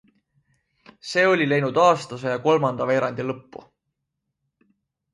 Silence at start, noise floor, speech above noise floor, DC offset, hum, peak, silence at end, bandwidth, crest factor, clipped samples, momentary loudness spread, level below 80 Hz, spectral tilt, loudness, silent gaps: 1.05 s; -80 dBFS; 59 dB; under 0.1%; none; -4 dBFS; 1.75 s; 11.5 kHz; 20 dB; under 0.1%; 12 LU; -68 dBFS; -5.5 dB/octave; -21 LUFS; none